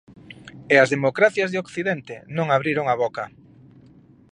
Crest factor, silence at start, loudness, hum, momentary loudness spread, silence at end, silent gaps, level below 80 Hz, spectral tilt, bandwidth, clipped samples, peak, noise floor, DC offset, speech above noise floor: 22 dB; 0.3 s; -21 LUFS; none; 19 LU; 1.05 s; none; -64 dBFS; -5.5 dB/octave; 10.5 kHz; under 0.1%; -2 dBFS; -51 dBFS; under 0.1%; 30 dB